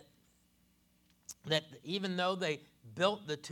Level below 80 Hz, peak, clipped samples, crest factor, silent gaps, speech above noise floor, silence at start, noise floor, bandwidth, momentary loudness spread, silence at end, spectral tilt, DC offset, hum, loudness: -78 dBFS; -14 dBFS; under 0.1%; 24 dB; none; 35 dB; 1.3 s; -71 dBFS; 18.5 kHz; 17 LU; 0 s; -4 dB/octave; under 0.1%; 60 Hz at -60 dBFS; -35 LUFS